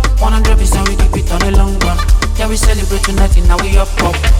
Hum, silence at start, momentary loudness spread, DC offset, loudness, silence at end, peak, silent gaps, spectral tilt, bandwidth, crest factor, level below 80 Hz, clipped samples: none; 0 s; 3 LU; under 0.1%; -13 LUFS; 0 s; 0 dBFS; none; -4.5 dB/octave; 15.5 kHz; 10 dB; -10 dBFS; under 0.1%